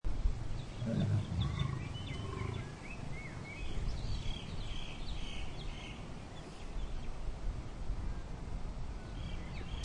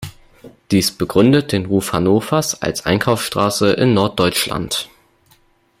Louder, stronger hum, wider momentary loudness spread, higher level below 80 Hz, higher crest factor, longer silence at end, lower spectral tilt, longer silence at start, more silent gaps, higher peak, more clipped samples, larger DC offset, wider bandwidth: second, -42 LUFS vs -16 LUFS; neither; first, 10 LU vs 7 LU; about the same, -42 dBFS vs -46 dBFS; about the same, 16 dB vs 16 dB; second, 0 s vs 0.95 s; about the same, -6 dB/octave vs -5 dB/octave; about the same, 0.05 s vs 0 s; neither; second, -22 dBFS vs -2 dBFS; neither; neither; second, 10.5 kHz vs 16 kHz